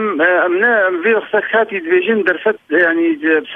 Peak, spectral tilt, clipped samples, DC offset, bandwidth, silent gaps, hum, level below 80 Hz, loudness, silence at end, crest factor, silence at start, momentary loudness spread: 0 dBFS; -7 dB/octave; under 0.1%; under 0.1%; 4 kHz; none; none; -66 dBFS; -14 LUFS; 0 s; 14 dB; 0 s; 3 LU